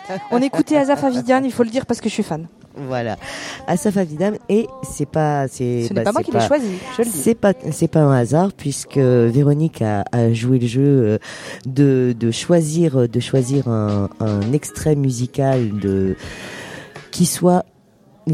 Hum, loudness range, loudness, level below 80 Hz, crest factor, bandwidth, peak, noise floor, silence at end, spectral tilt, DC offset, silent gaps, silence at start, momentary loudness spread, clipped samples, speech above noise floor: none; 4 LU; -18 LUFS; -50 dBFS; 16 dB; 15.5 kHz; -2 dBFS; -51 dBFS; 0 s; -6.5 dB/octave; under 0.1%; none; 0 s; 12 LU; under 0.1%; 34 dB